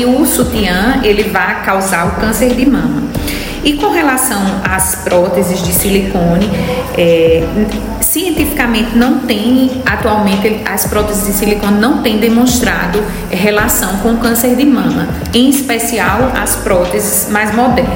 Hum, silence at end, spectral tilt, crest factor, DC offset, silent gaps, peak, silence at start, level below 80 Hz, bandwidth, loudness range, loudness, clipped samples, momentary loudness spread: none; 0 s; -4 dB/octave; 12 dB; under 0.1%; none; 0 dBFS; 0 s; -26 dBFS; 16.5 kHz; 1 LU; -11 LUFS; under 0.1%; 4 LU